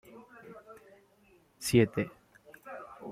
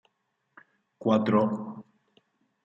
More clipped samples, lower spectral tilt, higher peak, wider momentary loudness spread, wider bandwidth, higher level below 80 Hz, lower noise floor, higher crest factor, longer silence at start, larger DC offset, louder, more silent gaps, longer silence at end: neither; second, -5.5 dB/octave vs -8.5 dB/octave; about the same, -12 dBFS vs -10 dBFS; first, 26 LU vs 18 LU; first, 16 kHz vs 7.2 kHz; first, -64 dBFS vs -74 dBFS; second, -65 dBFS vs -77 dBFS; about the same, 24 dB vs 20 dB; second, 0.15 s vs 1 s; neither; second, -29 LUFS vs -26 LUFS; neither; second, 0 s vs 0.8 s